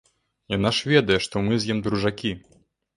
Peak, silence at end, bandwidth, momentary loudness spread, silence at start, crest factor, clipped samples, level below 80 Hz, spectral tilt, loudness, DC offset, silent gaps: -4 dBFS; 0.6 s; 11.5 kHz; 11 LU; 0.5 s; 20 dB; under 0.1%; -50 dBFS; -5.5 dB/octave; -23 LUFS; under 0.1%; none